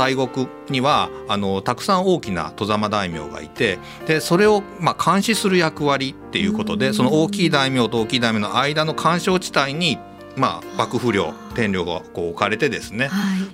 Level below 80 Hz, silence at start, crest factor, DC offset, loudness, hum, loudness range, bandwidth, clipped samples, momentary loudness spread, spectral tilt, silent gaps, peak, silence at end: -50 dBFS; 0 s; 20 dB; under 0.1%; -20 LUFS; none; 3 LU; 16 kHz; under 0.1%; 7 LU; -5 dB/octave; none; 0 dBFS; 0 s